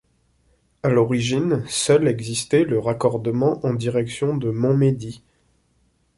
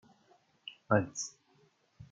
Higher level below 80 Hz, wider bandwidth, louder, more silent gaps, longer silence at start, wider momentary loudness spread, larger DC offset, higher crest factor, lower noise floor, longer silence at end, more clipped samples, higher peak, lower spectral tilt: first, -54 dBFS vs -72 dBFS; first, 11.5 kHz vs 9.4 kHz; first, -21 LUFS vs -33 LUFS; neither; first, 0.85 s vs 0.65 s; second, 5 LU vs 19 LU; neither; second, 16 dB vs 26 dB; second, -64 dBFS vs -69 dBFS; first, 1 s vs 0.05 s; neither; first, -4 dBFS vs -12 dBFS; first, -6 dB/octave vs -4.5 dB/octave